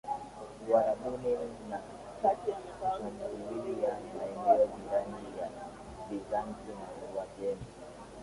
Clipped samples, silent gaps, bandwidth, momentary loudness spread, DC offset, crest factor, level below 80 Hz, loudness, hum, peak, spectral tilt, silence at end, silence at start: under 0.1%; none; 11.5 kHz; 17 LU; under 0.1%; 22 dB; -60 dBFS; -34 LUFS; none; -14 dBFS; -6.5 dB/octave; 0 s; 0.05 s